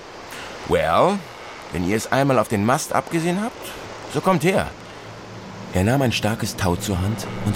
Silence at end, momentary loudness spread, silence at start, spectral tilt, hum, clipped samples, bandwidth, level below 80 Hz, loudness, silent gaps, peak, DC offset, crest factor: 0 s; 17 LU; 0 s; -5.5 dB/octave; none; under 0.1%; 16.5 kHz; -44 dBFS; -21 LUFS; none; -4 dBFS; 0.1%; 18 dB